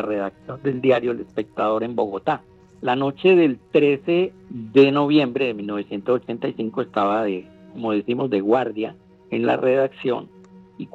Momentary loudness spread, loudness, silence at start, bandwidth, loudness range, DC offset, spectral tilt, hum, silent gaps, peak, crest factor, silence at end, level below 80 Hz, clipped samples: 13 LU; -21 LUFS; 0 s; 7.4 kHz; 5 LU; under 0.1%; -8 dB/octave; none; none; -2 dBFS; 18 dB; 0.05 s; -64 dBFS; under 0.1%